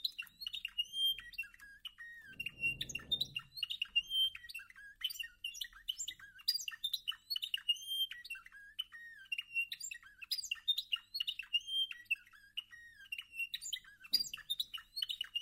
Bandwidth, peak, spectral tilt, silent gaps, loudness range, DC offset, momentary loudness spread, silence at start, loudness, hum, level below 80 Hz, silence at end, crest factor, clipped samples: 16 kHz; -20 dBFS; 1.5 dB/octave; none; 2 LU; under 0.1%; 14 LU; 0 s; -38 LUFS; none; -72 dBFS; 0 s; 22 dB; under 0.1%